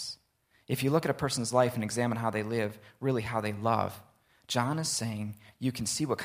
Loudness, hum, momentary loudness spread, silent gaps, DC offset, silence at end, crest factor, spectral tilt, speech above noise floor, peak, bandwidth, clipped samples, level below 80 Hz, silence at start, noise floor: -31 LUFS; none; 9 LU; none; under 0.1%; 0 s; 22 dB; -4.5 dB/octave; 39 dB; -10 dBFS; 16 kHz; under 0.1%; -64 dBFS; 0 s; -70 dBFS